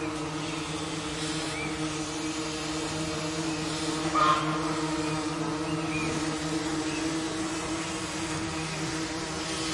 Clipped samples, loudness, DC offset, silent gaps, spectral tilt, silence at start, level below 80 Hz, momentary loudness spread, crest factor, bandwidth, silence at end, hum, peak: under 0.1%; -30 LUFS; under 0.1%; none; -4 dB/octave; 0 s; -52 dBFS; 5 LU; 18 dB; 11.5 kHz; 0 s; none; -12 dBFS